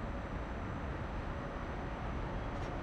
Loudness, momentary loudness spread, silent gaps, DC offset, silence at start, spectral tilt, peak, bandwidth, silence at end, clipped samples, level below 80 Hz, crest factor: -42 LUFS; 1 LU; none; under 0.1%; 0 s; -7.5 dB/octave; -28 dBFS; 9 kHz; 0 s; under 0.1%; -44 dBFS; 12 dB